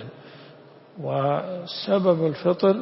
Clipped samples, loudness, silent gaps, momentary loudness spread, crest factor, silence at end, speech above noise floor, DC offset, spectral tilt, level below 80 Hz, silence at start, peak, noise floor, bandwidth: under 0.1%; -23 LUFS; none; 15 LU; 18 dB; 0 s; 26 dB; under 0.1%; -11 dB/octave; -68 dBFS; 0 s; -6 dBFS; -48 dBFS; 5.8 kHz